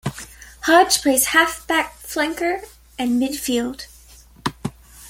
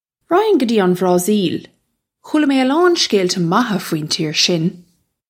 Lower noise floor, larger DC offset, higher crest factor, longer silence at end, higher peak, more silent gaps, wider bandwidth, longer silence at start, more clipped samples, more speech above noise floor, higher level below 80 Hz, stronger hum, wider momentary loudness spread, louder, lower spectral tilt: second, -47 dBFS vs -68 dBFS; neither; about the same, 20 dB vs 16 dB; second, 0 s vs 0.5 s; about the same, 0 dBFS vs 0 dBFS; neither; about the same, 17 kHz vs 16.5 kHz; second, 0.05 s vs 0.3 s; neither; second, 28 dB vs 53 dB; first, -48 dBFS vs -64 dBFS; neither; first, 20 LU vs 7 LU; second, -19 LUFS vs -16 LUFS; second, -2.5 dB/octave vs -4.5 dB/octave